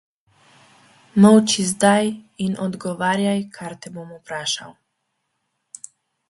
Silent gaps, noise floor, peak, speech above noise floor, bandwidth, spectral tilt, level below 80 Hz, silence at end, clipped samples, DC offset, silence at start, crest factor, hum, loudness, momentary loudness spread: none; -74 dBFS; 0 dBFS; 55 dB; 11.5 kHz; -4.5 dB/octave; -64 dBFS; 1.6 s; under 0.1%; under 0.1%; 1.15 s; 20 dB; none; -19 LUFS; 23 LU